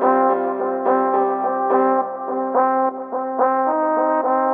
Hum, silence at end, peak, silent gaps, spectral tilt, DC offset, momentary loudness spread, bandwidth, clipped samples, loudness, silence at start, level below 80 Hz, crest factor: none; 0 s; -2 dBFS; none; -5.5 dB/octave; under 0.1%; 5 LU; 3.5 kHz; under 0.1%; -19 LUFS; 0 s; under -90 dBFS; 16 dB